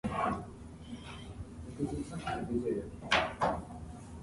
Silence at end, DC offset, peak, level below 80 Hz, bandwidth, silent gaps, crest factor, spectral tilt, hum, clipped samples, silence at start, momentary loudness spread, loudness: 0 s; under 0.1%; -14 dBFS; -52 dBFS; 11.5 kHz; none; 22 dB; -5 dB/octave; none; under 0.1%; 0.05 s; 17 LU; -35 LUFS